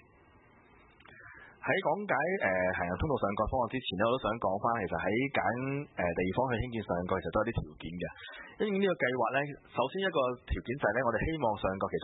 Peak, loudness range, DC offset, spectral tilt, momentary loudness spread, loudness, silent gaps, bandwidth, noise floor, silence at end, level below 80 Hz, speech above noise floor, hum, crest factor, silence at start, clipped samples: -14 dBFS; 2 LU; under 0.1%; -2.5 dB/octave; 10 LU; -32 LUFS; none; 3.9 kHz; -61 dBFS; 0 s; -50 dBFS; 29 dB; none; 18 dB; 1.1 s; under 0.1%